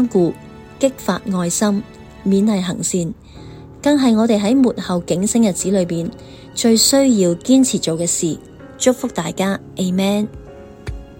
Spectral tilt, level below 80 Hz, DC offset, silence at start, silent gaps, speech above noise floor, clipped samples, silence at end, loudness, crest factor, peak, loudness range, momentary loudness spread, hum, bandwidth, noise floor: -4.5 dB/octave; -44 dBFS; under 0.1%; 0 s; none; 20 dB; under 0.1%; 0.05 s; -17 LUFS; 16 dB; 0 dBFS; 4 LU; 16 LU; none; 16.5 kHz; -37 dBFS